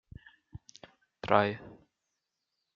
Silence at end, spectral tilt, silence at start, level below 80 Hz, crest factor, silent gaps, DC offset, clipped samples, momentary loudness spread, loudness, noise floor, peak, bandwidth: 1 s; -4 dB/octave; 0.55 s; -64 dBFS; 28 dB; none; under 0.1%; under 0.1%; 25 LU; -29 LUFS; -84 dBFS; -8 dBFS; 7.4 kHz